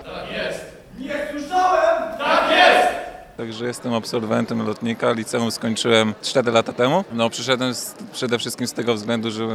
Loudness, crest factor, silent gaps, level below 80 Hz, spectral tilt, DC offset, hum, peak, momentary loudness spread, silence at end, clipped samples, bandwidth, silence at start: -20 LUFS; 20 dB; none; -54 dBFS; -4 dB/octave; under 0.1%; none; 0 dBFS; 13 LU; 0 s; under 0.1%; 15.5 kHz; 0 s